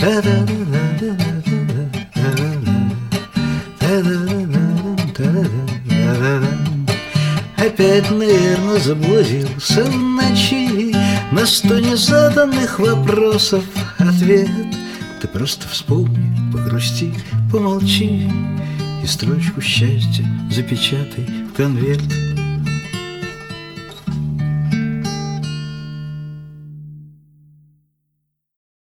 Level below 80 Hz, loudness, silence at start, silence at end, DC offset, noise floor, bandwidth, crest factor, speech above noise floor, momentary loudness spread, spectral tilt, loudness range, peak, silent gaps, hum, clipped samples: -44 dBFS; -17 LUFS; 0 s; 1.75 s; under 0.1%; -72 dBFS; 16.5 kHz; 16 dB; 57 dB; 12 LU; -5.5 dB/octave; 9 LU; -2 dBFS; none; none; under 0.1%